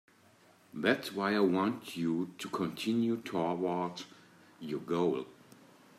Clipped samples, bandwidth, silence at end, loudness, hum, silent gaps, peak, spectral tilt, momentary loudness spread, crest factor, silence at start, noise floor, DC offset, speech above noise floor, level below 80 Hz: under 0.1%; 15 kHz; 0.65 s; -33 LUFS; none; none; -14 dBFS; -6 dB/octave; 14 LU; 22 dB; 0.75 s; -63 dBFS; under 0.1%; 30 dB; -78 dBFS